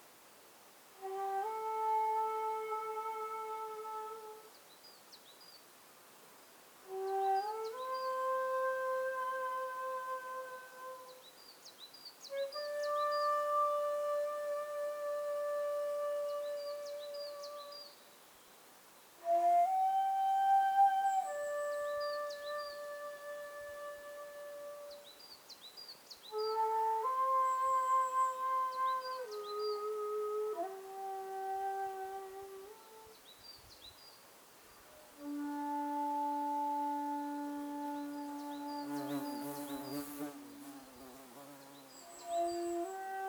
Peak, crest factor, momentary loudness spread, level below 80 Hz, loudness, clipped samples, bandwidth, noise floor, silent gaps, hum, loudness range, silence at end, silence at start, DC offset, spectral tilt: -20 dBFS; 18 dB; 23 LU; -84 dBFS; -37 LUFS; under 0.1%; over 20 kHz; -60 dBFS; none; none; 12 LU; 0 s; 0 s; under 0.1%; -3 dB/octave